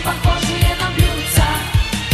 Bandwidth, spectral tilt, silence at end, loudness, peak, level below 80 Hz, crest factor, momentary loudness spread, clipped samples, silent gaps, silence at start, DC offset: 14 kHz; -4 dB/octave; 0 s; -17 LUFS; 0 dBFS; -22 dBFS; 16 dB; 3 LU; under 0.1%; none; 0 s; under 0.1%